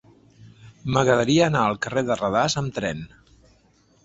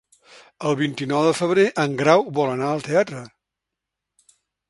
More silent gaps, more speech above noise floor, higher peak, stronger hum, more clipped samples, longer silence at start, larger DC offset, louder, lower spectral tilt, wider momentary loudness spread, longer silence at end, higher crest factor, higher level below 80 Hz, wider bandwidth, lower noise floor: neither; second, 38 dB vs 64 dB; about the same, -4 dBFS vs -2 dBFS; neither; neither; second, 0.4 s vs 0.6 s; neither; about the same, -22 LUFS vs -20 LUFS; about the same, -5 dB/octave vs -5.5 dB/octave; first, 14 LU vs 8 LU; second, 0.95 s vs 1.45 s; about the same, 20 dB vs 20 dB; first, -52 dBFS vs -66 dBFS; second, 8.2 kHz vs 11.5 kHz; second, -59 dBFS vs -84 dBFS